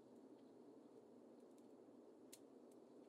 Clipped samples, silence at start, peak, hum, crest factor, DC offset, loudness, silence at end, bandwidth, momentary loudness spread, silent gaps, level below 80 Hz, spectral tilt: under 0.1%; 0 s; -44 dBFS; none; 20 dB; under 0.1%; -65 LUFS; 0 s; 12 kHz; 2 LU; none; under -90 dBFS; -4.5 dB/octave